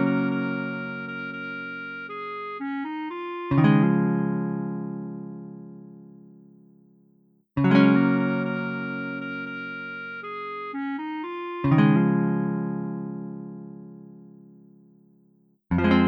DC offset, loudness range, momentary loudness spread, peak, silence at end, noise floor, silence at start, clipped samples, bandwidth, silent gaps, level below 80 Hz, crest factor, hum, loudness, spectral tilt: under 0.1%; 8 LU; 20 LU; -4 dBFS; 0 s; -62 dBFS; 0 s; under 0.1%; 5.4 kHz; none; -54 dBFS; 22 dB; none; -26 LUFS; -10 dB/octave